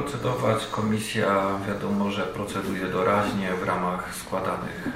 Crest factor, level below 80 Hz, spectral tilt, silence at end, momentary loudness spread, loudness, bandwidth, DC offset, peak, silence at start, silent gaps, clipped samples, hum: 18 dB; -52 dBFS; -5.5 dB/octave; 0 s; 6 LU; -26 LUFS; 16 kHz; under 0.1%; -8 dBFS; 0 s; none; under 0.1%; none